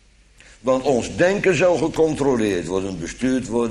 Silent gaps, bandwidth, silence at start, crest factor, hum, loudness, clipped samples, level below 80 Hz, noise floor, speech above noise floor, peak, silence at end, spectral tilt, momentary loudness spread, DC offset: none; 12 kHz; 0.65 s; 16 dB; none; -20 LUFS; under 0.1%; -44 dBFS; -50 dBFS; 31 dB; -4 dBFS; 0 s; -5.5 dB/octave; 8 LU; under 0.1%